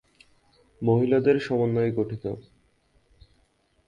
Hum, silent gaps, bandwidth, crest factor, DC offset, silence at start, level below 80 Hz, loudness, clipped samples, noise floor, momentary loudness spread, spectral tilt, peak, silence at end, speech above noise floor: none; none; 7.4 kHz; 18 dB; under 0.1%; 0.8 s; -58 dBFS; -24 LUFS; under 0.1%; -66 dBFS; 13 LU; -9 dB/octave; -8 dBFS; 1.5 s; 43 dB